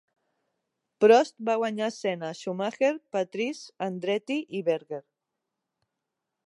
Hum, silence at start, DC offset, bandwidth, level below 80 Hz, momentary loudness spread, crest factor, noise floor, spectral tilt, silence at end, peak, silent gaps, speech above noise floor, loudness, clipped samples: none; 1 s; under 0.1%; 11 kHz; -86 dBFS; 14 LU; 22 dB; -85 dBFS; -5 dB/octave; 1.45 s; -6 dBFS; none; 58 dB; -27 LUFS; under 0.1%